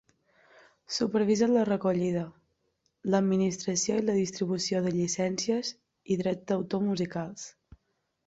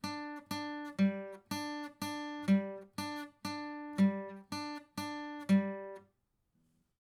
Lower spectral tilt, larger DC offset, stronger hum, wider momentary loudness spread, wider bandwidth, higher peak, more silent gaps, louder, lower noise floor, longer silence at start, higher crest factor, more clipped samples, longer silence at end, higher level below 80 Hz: about the same, -5 dB/octave vs -6 dB/octave; neither; neither; about the same, 11 LU vs 12 LU; second, 8 kHz vs 14.5 kHz; first, -12 dBFS vs -18 dBFS; neither; first, -29 LUFS vs -37 LUFS; about the same, -76 dBFS vs -78 dBFS; first, 0.9 s vs 0.05 s; about the same, 18 dB vs 18 dB; neither; second, 0.75 s vs 1.1 s; first, -66 dBFS vs -82 dBFS